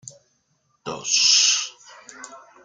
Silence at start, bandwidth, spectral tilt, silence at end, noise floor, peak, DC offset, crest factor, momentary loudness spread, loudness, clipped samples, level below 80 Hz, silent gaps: 0.05 s; 13.5 kHz; 2 dB/octave; 0.25 s; -68 dBFS; -4 dBFS; under 0.1%; 20 dB; 26 LU; -17 LUFS; under 0.1%; -70 dBFS; none